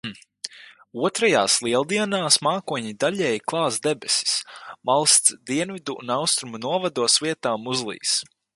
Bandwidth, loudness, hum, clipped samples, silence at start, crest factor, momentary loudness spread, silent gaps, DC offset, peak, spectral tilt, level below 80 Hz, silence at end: 12 kHz; -21 LUFS; none; under 0.1%; 0.05 s; 22 dB; 14 LU; none; under 0.1%; -2 dBFS; -2 dB/octave; -68 dBFS; 0.35 s